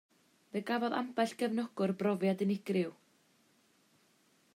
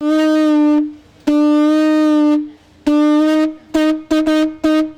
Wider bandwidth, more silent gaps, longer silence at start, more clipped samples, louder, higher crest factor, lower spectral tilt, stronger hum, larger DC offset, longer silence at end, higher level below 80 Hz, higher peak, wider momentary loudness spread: first, 15 kHz vs 9.6 kHz; neither; first, 0.55 s vs 0 s; neither; second, -35 LUFS vs -14 LUFS; first, 18 dB vs 12 dB; first, -6.5 dB/octave vs -4.5 dB/octave; neither; neither; first, 1.65 s vs 0.05 s; second, -86 dBFS vs -48 dBFS; second, -18 dBFS vs -2 dBFS; about the same, 6 LU vs 6 LU